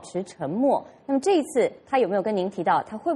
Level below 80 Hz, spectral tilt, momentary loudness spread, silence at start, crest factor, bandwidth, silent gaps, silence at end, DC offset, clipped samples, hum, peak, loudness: -68 dBFS; -5.5 dB/octave; 7 LU; 0 s; 16 dB; 11.5 kHz; none; 0 s; under 0.1%; under 0.1%; none; -8 dBFS; -24 LUFS